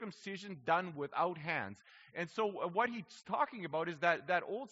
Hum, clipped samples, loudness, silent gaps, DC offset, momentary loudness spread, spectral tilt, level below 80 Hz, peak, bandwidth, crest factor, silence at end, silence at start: none; under 0.1%; -37 LUFS; none; under 0.1%; 11 LU; -3 dB/octave; -84 dBFS; -16 dBFS; 7.6 kHz; 22 dB; 0.05 s; 0 s